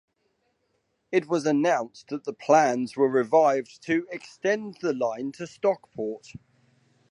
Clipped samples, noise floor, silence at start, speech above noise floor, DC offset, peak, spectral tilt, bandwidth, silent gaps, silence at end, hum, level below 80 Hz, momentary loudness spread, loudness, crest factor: under 0.1%; -73 dBFS; 1.1 s; 48 dB; under 0.1%; -6 dBFS; -5.5 dB/octave; 11 kHz; none; 0.95 s; none; -72 dBFS; 14 LU; -25 LUFS; 20 dB